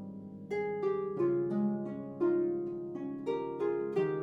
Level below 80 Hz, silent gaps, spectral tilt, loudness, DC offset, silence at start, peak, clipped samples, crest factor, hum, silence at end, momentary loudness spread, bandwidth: -74 dBFS; none; -9.5 dB/octave; -34 LUFS; under 0.1%; 0 s; -22 dBFS; under 0.1%; 12 dB; none; 0 s; 9 LU; 5.8 kHz